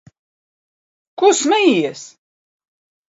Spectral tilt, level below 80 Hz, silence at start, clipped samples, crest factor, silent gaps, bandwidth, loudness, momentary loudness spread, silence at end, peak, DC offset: -3 dB/octave; -72 dBFS; 1.2 s; under 0.1%; 18 dB; none; 8 kHz; -15 LUFS; 12 LU; 1 s; -2 dBFS; under 0.1%